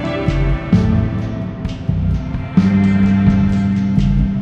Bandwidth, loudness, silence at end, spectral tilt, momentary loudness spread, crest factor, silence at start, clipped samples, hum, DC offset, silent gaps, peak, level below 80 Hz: 7 kHz; -16 LUFS; 0 s; -9 dB/octave; 9 LU; 14 dB; 0 s; under 0.1%; none; under 0.1%; none; 0 dBFS; -24 dBFS